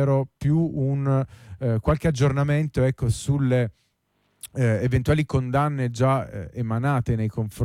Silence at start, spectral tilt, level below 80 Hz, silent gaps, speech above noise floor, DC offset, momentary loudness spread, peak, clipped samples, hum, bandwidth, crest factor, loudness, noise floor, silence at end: 0 s; -7.5 dB/octave; -42 dBFS; none; 47 dB; under 0.1%; 7 LU; -10 dBFS; under 0.1%; none; 13 kHz; 12 dB; -23 LUFS; -70 dBFS; 0 s